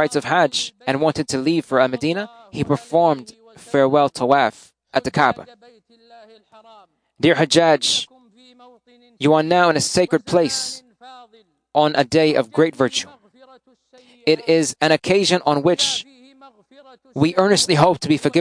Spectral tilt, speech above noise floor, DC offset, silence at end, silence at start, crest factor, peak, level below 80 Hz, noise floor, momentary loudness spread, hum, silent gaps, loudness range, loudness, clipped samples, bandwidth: -4 dB/octave; 37 dB; under 0.1%; 0 s; 0 s; 18 dB; 0 dBFS; -58 dBFS; -54 dBFS; 9 LU; none; none; 3 LU; -18 LUFS; under 0.1%; 10.5 kHz